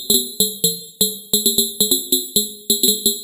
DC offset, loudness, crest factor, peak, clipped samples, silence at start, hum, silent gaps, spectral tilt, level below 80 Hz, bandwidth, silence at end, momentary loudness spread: under 0.1%; -16 LUFS; 18 dB; -2 dBFS; under 0.1%; 0 s; none; none; -2 dB/octave; -54 dBFS; 17 kHz; 0 s; 5 LU